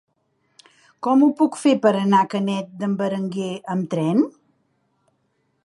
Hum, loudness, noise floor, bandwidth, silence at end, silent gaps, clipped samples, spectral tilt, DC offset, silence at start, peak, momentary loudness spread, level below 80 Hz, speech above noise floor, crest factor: none; -20 LUFS; -69 dBFS; 11.5 kHz; 1.35 s; none; under 0.1%; -6.5 dB/octave; under 0.1%; 1 s; -4 dBFS; 9 LU; -74 dBFS; 49 dB; 18 dB